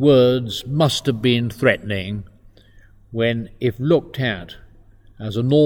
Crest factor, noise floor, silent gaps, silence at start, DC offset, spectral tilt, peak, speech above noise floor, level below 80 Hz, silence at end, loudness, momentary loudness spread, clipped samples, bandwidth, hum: 20 dB; -48 dBFS; none; 0 s; under 0.1%; -6 dB/octave; 0 dBFS; 30 dB; -48 dBFS; 0 s; -20 LUFS; 13 LU; under 0.1%; 18.5 kHz; none